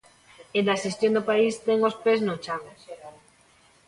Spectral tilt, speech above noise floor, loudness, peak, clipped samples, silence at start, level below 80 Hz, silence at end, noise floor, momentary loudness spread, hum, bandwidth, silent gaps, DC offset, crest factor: -5 dB/octave; 35 dB; -25 LUFS; -10 dBFS; under 0.1%; 0.55 s; -68 dBFS; 0.75 s; -59 dBFS; 21 LU; none; 11.5 kHz; none; under 0.1%; 16 dB